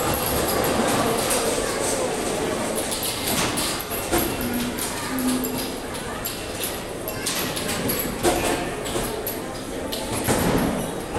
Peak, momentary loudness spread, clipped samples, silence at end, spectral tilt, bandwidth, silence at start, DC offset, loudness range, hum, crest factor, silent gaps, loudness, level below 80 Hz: -8 dBFS; 7 LU; under 0.1%; 0 s; -3.5 dB/octave; 17.5 kHz; 0 s; under 0.1%; 3 LU; none; 16 dB; none; -24 LUFS; -40 dBFS